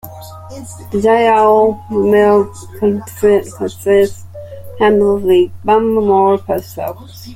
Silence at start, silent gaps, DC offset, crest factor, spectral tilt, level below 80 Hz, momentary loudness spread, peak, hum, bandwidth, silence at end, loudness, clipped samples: 0.05 s; none; under 0.1%; 12 dB; -6 dB/octave; -46 dBFS; 21 LU; 0 dBFS; none; 16 kHz; 0 s; -13 LUFS; under 0.1%